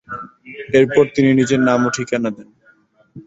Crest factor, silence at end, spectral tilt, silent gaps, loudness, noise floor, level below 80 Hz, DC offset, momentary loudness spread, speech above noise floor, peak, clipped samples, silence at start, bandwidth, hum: 16 dB; 0.05 s; -6 dB/octave; none; -16 LUFS; -54 dBFS; -54 dBFS; under 0.1%; 19 LU; 39 dB; -2 dBFS; under 0.1%; 0.1 s; 8 kHz; none